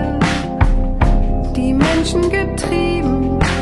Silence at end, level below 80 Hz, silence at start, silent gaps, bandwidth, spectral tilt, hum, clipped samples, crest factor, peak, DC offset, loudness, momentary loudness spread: 0 s; -20 dBFS; 0 s; none; 11.5 kHz; -6 dB/octave; none; under 0.1%; 14 dB; 0 dBFS; under 0.1%; -17 LUFS; 4 LU